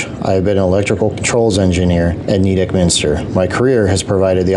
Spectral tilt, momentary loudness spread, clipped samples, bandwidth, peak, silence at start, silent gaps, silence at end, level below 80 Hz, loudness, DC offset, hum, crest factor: -5.5 dB/octave; 3 LU; under 0.1%; 11.5 kHz; -2 dBFS; 0 s; none; 0 s; -36 dBFS; -14 LUFS; under 0.1%; none; 10 dB